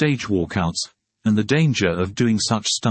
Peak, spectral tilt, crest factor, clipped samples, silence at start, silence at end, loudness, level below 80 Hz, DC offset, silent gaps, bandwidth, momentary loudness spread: -4 dBFS; -5 dB/octave; 16 dB; under 0.1%; 0 s; 0 s; -20 LUFS; -52 dBFS; under 0.1%; none; 8.8 kHz; 7 LU